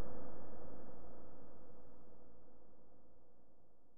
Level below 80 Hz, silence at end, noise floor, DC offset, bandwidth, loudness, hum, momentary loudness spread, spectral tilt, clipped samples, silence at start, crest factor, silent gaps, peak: -70 dBFS; 0 s; -69 dBFS; under 0.1%; 1.9 kHz; -59 LUFS; none; 13 LU; -4 dB/octave; under 0.1%; 0 s; 10 dB; none; -28 dBFS